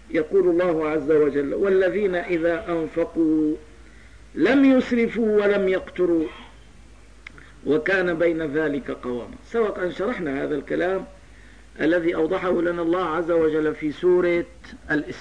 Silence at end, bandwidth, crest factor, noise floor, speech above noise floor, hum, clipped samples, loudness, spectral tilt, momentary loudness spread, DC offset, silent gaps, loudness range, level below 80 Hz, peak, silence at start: 0 s; 10 kHz; 14 dB; -48 dBFS; 26 dB; none; under 0.1%; -22 LUFS; -7 dB/octave; 9 LU; 0.3%; none; 4 LU; -50 dBFS; -8 dBFS; 0.1 s